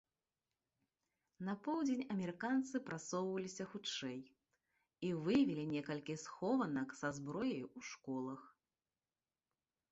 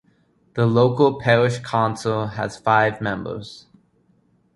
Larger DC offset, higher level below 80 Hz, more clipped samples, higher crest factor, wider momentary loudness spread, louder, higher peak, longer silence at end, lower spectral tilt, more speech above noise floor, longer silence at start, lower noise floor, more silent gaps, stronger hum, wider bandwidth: neither; second, -80 dBFS vs -54 dBFS; neither; about the same, 18 dB vs 18 dB; second, 11 LU vs 14 LU; second, -42 LUFS vs -20 LUFS; second, -24 dBFS vs -2 dBFS; first, 1.4 s vs 0.95 s; second, -5 dB/octave vs -6.5 dB/octave; first, over 49 dB vs 41 dB; first, 1.4 s vs 0.55 s; first, under -90 dBFS vs -61 dBFS; neither; neither; second, 8 kHz vs 11.5 kHz